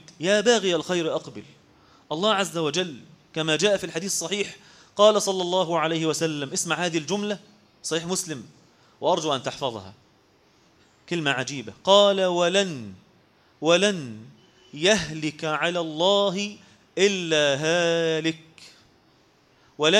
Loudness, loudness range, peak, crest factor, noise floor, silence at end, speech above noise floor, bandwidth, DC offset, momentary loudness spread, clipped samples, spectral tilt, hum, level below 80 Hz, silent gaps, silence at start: -23 LUFS; 6 LU; -4 dBFS; 22 dB; -60 dBFS; 0 s; 36 dB; 15.5 kHz; under 0.1%; 15 LU; under 0.1%; -3.5 dB/octave; none; -64 dBFS; none; 0.2 s